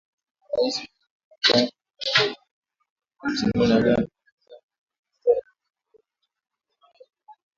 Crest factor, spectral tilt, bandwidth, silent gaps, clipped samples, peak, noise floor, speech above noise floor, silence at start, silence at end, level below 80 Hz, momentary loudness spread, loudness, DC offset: 22 dB; -4.5 dB/octave; 7.6 kHz; 1.10-1.31 s, 2.51-2.62 s, 2.90-2.96 s, 4.32-4.38 s, 4.63-4.69 s, 4.78-4.87 s, 4.99-5.03 s; under 0.1%; -4 dBFS; -64 dBFS; 43 dB; 0.5 s; 0.25 s; -54 dBFS; 13 LU; -23 LUFS; under 0.1%